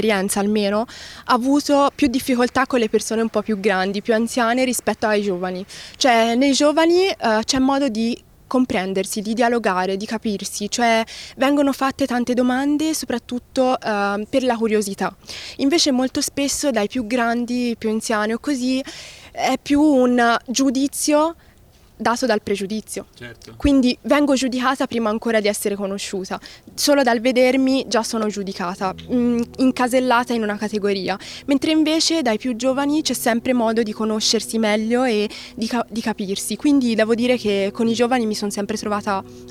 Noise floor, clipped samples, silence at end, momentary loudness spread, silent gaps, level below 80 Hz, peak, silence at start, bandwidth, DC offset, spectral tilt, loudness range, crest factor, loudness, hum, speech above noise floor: -50 dBFS; under 0.1%; 0 s; 9 LU; none; -50 dBFS; -4 dBFS; 0 s; 16 kHz; under 0.1%; -3.5 dB/octave; 3 LU; 16 dB; -19 LUFS; none; 30 dB